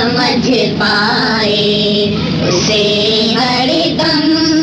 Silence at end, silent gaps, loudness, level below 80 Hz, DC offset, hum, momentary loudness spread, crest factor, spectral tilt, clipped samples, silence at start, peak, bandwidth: 0 s; none; -11 LUFS; -40 dBFS; under 0.1%; none; 2 LU; 8 dB; -4.5 dB/octave; under 0.1%; 0 s; -4 dBFS; 9.4 kHz